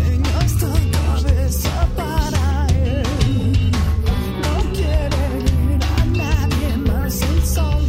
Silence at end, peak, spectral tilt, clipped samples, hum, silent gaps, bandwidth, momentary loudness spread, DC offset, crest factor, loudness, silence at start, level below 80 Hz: 0 s; -4 dBFS; -6 dB/octave; under 0.1%; none; none; 16.5 kHz; 2 LU; under 0.1%; 12 dB; -19 LUFS; 0 s; -20 dBFS